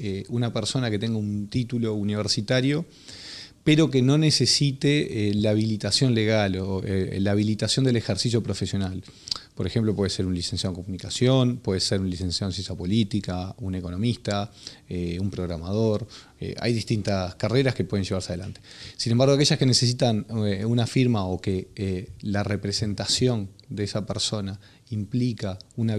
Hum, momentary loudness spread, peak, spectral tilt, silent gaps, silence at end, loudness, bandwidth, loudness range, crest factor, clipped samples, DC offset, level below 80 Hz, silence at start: none; 12 LU; -6 dBFS; -5.5 dB/octave; none; 0 s; -25 LUFS; 12.5 kHz; 6 LU; 18 dB; under 0.1%; under 0.1%; -54 dBFS; 0 s